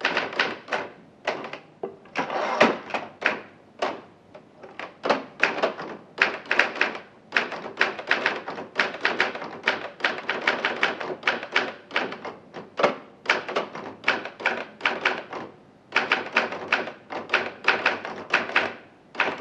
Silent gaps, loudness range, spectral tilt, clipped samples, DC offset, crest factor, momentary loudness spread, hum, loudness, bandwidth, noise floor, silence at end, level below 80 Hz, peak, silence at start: none; 3 LU; -3 dB/octave; under 0.1%; under 0.1%; 26 dB; 14 LU; none; -26 LUFS; 10 kHz; -50 dBFS; 0 s; -74 dBFS; -2 dBFS; 0 s